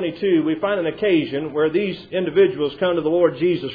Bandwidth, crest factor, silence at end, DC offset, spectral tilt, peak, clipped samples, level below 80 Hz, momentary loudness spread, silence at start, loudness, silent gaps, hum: 5 kHz; 14 dB; 0 s; under 0.1%; -9 dB/octave; -4 dBFS; under 0.1%; -58 dBFS; 5 LU; 0 s; -20 LUFS; none; none